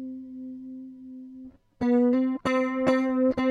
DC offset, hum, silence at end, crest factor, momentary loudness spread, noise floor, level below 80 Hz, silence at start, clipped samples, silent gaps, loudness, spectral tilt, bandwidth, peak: under 0.1%; none; 0 s; 16 dB; 20 LU; -47 dBFS; -60 dBFS; 0 s; under 0.1%; none; -24 LUFS; -6.5 dB/octave; 9.8 kHz; -10 dBFS